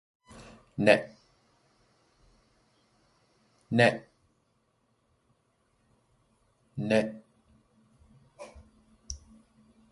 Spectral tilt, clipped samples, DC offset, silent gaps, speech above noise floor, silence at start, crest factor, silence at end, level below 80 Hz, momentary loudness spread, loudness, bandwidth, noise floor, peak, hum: -5.5 dB/octave; under 0.1%; under 0.1%; none; 48 dB; 0.35 s; 28 dB; 0.75 s; -60 dBFS; 27 LU; -27 LUFS; 11.5 kHz; -73 dBFS; -6 dBFS; none